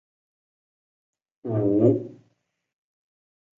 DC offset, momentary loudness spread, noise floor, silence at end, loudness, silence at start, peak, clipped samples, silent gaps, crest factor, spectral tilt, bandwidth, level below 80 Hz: under 0.1%; 19 LU; -73 dBFS; 1.45 s; -23 LUFS; 1.45 s; -6 dBFS; under 0.1%; none; 22 dB; -12 dB/octave; 3.2 kHz; -64 dBFS